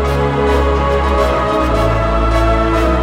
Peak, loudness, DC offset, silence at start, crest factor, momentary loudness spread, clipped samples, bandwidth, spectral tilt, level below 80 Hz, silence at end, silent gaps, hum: -2 dBFS; -14 LUFS; under 0.1%; 0 s; 12 dB; 1 LU; under 0.1%; 13.5 kHz; -7 dB/octave; -18 dBFS; 0 s; none; none